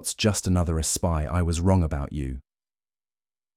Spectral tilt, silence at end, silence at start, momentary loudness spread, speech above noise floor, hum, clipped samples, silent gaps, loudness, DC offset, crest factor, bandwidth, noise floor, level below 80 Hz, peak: -5 dB/octave; 1.15 s; 0 s; 10 LU; over 66 dB; none; under 0.1%; none; -25 LUFS; under 0.1%; 16 dB; 16 kHz; under -90 dBFS; -38 dBFS; -10 dBFS